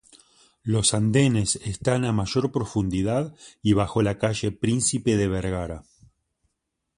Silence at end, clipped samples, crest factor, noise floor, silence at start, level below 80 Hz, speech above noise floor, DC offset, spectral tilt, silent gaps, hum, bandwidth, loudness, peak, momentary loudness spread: 1.15 s; under 0.1%; 18 dB; -79 dBFS; 0.65 s; -44 dBFS; 56 dB; under 0.1%; -5 dB/octave; none; none; 11.5 kHz; -24 LUFS; -6 dBFS; 9 LU